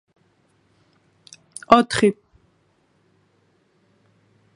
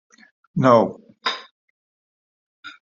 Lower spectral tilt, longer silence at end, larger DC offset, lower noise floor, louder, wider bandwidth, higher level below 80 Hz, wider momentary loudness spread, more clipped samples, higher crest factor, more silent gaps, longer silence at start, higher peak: about the same, -4.5 dB/octave vs -4.5 dB/octave; first, 2.45 s vs 0.2 s; neither; second, -63 dBFS vs under -90 dBFS; first, -17 LUFS vs -20 LUFS; first, 11.5 kHz vs 7.6 kHz; first, -58 dBFS vs -64 dBFS; first, 25 LU vs 15 LU; neither; about the same, 26 dB vs 22 dB; second, none vs 1.51-2.63 s; first, 1.7 s vs 0.55 s; about the same, 0 dBFS vs -2 dBFS